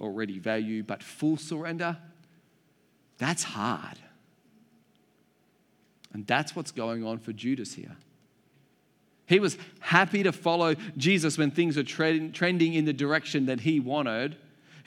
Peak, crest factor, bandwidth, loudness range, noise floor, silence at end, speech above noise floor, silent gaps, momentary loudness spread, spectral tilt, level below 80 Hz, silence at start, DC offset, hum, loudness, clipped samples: -4 dBFS; 26 dB; 14 kHz; 10 LU; -67 dBFS; 0.05 s; 39 dB; none; 11 LU; -5 dB/octave; -82 dBFS; 0 s; under 0.1%; none; -28 LUFS; under 0.1%